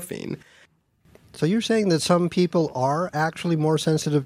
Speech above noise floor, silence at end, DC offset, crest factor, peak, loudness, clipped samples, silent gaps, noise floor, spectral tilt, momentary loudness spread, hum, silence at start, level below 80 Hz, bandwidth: 37 dB; 0 s; under 0.1%; 18 dB; -4 dBFS; -23 LUFS; under 0.1%; none; -60 dBFS; -5.5 dB/octave; 12 LU; none; 0 s; -62 dBFS; 15.5 kHz